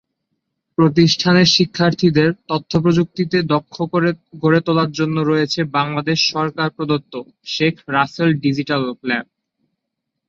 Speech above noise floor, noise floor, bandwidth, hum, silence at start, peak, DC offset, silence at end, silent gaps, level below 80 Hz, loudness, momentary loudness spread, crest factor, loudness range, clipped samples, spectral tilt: 61 dB; -78 dBFS; 7.2 kHz; none; 0.8 s; -2 dBFS; under 0.1%; 1.05 s; none; -54 dBFS; -17 LUFS; 9 LU; 16 dB; 5 LU; under 0.1%; -5.5 dB/octave